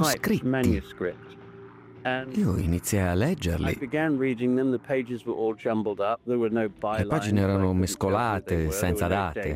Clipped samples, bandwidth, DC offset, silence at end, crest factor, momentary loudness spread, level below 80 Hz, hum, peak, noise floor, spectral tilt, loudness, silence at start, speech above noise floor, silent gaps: under 0.1%; 16 kHz; under 0.1%; 0 s; 16 dB; 6 LU; -46 dBFS; none; -10 dBFS; -46 dBFS; -6 dB/octave; -27 LUFS; 0 s; 21 dB; none